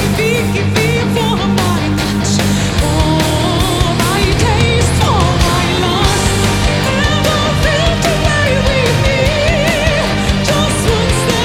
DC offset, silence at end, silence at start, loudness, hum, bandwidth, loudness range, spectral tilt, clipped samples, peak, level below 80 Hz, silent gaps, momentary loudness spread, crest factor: under 0.1%; 0 s; 0 s; -12 LUFS; none; 17.5 kHz; 1 LU; -4.5 dB/octave; under 0.1%; 0 dBFS; -22 dBFS; none; 2 LU; 12 dB